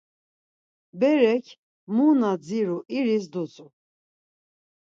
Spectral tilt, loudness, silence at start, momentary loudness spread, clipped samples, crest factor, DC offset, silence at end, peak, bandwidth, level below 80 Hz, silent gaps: -7 dB/octave; -23 LUFS; 0.95 s; 11 LU; under 0.1%; 18 dB; under 0.1%; 1.25 s; -8 dBFS; 7.6 kHz; -78 dBFS; 1.58-1.87 s